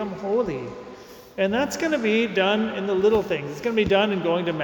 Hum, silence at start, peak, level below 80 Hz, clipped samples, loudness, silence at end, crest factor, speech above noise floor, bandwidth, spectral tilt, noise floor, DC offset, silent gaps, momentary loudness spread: none; 0 s; -8 dBFS; -52 dBFS; under 0.1%; -23 LUFS; 0 s; 16 dB; 20 dB; 19 kHz; -5 dB/octave; -43 dBFS; under 0.1%; none; 15 LU